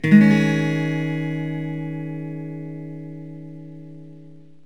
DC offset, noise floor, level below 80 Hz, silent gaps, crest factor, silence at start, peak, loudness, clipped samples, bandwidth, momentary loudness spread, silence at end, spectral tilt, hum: 0.5%; -46 dBFS; -72 dBFS; none; 20 dB; 0.05 s; -2 dBFS; -21 LUFS; under 0.1%; 9.8 kHz; 23 LU; 0.3 s; -7.5 dB/octave; none